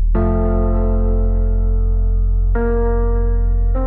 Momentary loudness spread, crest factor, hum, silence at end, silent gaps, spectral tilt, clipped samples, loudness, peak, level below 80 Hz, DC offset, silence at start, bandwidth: 2 LU; 8 dB; 50 Hz at -45 dBFS; 0 s; none; -14 dB/octave; under 0.1%; -19 LUFS; -6 dBFS; -16 dBFS; 0.3%; 0 s; 2.1 kHz